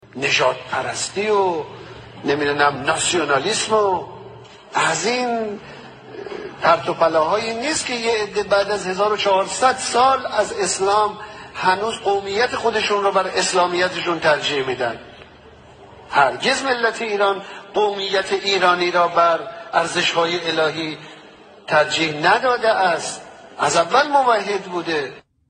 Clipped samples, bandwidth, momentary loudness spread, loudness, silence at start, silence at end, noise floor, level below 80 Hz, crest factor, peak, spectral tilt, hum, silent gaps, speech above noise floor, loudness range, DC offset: under 0.1%; 10 kHz; 12 LU; -19 LUFS; 0.15 s; 0.3 s; -44 dBFS; -58 dBFS; 18 dB; -2 dBFS; -2.5 dB/octave; none; none; 26 dB; 3 LU; under 0.1%